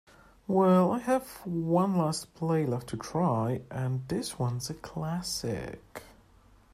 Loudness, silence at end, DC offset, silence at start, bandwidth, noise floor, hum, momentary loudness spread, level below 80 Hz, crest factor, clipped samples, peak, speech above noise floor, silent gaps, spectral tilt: -30 LUFS; 0.65 s; under 0.1%; 0.5 s; 15 kHz; -59 dBFS; none; 13 LU; -58 dBFS; 18 dB; under 0.1%; -12 dBFS; 30 dB; none; -6.5 dB/octave